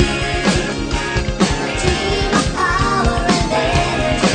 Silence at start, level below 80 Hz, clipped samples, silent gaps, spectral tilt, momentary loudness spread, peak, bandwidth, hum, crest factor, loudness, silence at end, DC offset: 0 s; -24 dBFS; under 0.1%; none; -4.5 dB/octave; 4 LU; 0 dBFS; 9.6 kHz; none; 16 dB; -17 LUFS; 0 s; under 0.1%